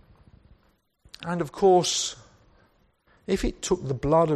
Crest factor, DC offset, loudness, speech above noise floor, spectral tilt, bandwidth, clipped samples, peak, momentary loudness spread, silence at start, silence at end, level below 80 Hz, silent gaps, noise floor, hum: 18 dB; under 0.1%; -25 LUFS; 42 dB; -4.5 dB/octave; 13 kHz; under 0.1%; -8 dBFS; 17 LU; 1.2 s; 0 s; -44 dBFS; none; -66 dBFS; none